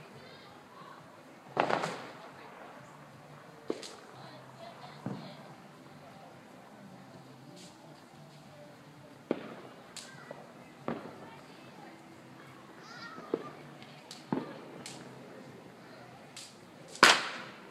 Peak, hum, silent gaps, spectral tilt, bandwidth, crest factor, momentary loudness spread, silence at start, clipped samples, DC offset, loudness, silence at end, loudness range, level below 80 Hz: -2 dBFS; none; none; -2.5 dB/octave; 15.5 kHz; 38 dB; 18 LU; 0 s; under 0.1%; under 0.1%; -33 LUFS; 0 s; 10 LU; -78 dBFS